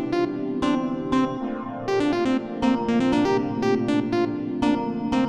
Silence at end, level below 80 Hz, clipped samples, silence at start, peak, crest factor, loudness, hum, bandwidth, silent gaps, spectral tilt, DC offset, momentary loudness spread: 0 s; -50 dBFS; under 0.1%; 0 s; -10 dBFS; 14 dB; -24 LUFS; none; 10 kHz; none; -6.5 dB/octave; 0.1%; 5 LU